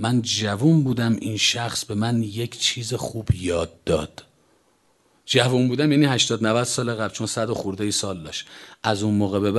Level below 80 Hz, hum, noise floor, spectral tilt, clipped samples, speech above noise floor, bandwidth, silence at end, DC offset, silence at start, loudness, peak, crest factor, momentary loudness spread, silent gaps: -46 dBFS; none; -62 dBFS; -4.5 dB/octave; under 0.1%; 40 dB; 12.5 kHz; 0 s; under 0.1%; 0 s; -22 LUFS; -2 dBFS; 20 dB; 9 LU; none